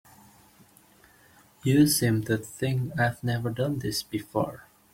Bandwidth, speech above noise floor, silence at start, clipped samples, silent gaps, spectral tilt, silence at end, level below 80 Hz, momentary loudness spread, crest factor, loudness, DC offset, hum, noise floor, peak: 16.5 kHz; 32 dB; 1.65 s; under 0.1%; none; -5 dB/octave; 0.3 s; -58 dBFS; 10 LU; 18 dB; -27 LUFS; under 0.1%; none; -58 dBFS; -10 dBFS